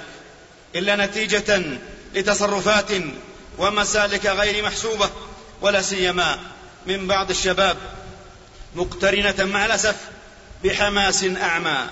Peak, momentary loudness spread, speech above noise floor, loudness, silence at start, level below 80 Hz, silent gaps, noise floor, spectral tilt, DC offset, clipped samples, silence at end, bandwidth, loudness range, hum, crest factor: -6 dBFS; 17 LU; 25 dB; -20 LUFS; 0 s; -42 dBFS; none; -46 dBFS; -2.5 dB/octave; under 0.1%; under 0.1%; 0 s; 8 kHz; 2 LU; none; 16 dB